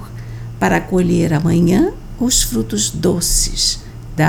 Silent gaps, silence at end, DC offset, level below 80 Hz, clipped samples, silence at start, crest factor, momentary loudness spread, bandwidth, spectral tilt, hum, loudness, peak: none; 0 s; under 0.1%; -28 dBFS; under 0.1%; 0 s; 14 dB; 13 LU; 19 kHz; -4 dB/octave; none; -15 LUFS; -2 dBFS